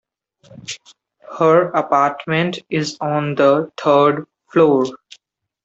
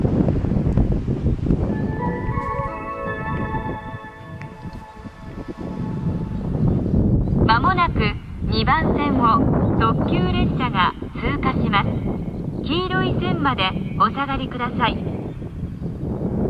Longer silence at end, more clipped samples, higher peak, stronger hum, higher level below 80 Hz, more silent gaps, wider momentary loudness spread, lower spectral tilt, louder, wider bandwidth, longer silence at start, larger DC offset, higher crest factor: first, 0.7 s vs 0 s; neither; about the same, -2 dBFS vs -4 dBFS; neither; second, -64 dBFS vs -30 dBFS; neither; first, 17 LU vs 13 LU; second, -6 dB/octave vs -8.5 dB/octave; first, -17 LUFS vs -21 LUFS; first, 8.2 kHz vs 7 kHz; first, 0.55 s vs 0 s; neither; about the same, 16 dB vs 18 dB